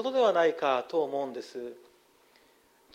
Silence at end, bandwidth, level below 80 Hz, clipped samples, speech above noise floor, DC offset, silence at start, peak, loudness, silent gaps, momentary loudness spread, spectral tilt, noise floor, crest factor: 1.2 s; 11.5 kHz; -82 dBFS; under 0.1%; 35 dB; under 0.1%; 0 s; -14 dBFS; -28 LUFS; none; 17 LU; -4.5 dB/octave; -63 dBFS; 18 dB